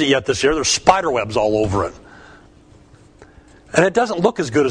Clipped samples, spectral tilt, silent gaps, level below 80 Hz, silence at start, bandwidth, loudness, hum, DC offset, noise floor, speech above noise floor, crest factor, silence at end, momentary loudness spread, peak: under 0.1%; -4 dB/octave; none; -42 dBFS; 0 s; 10.5 kHz; -17 LUFS; none; under 0.1%; -47 dBFS; 30 dB; 18 dB; 0 s; 6 LU; 0 dBFS